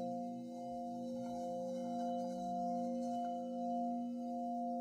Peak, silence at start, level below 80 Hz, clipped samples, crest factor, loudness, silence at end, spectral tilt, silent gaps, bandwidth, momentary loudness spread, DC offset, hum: -30 dBFS; 0 s; -78 dBFS; under 0.1%; 10 dB; -42 LUFS; 0 s; -7.5 dB/octave; none; 11 kHz; 5 LU; under 0.1%; none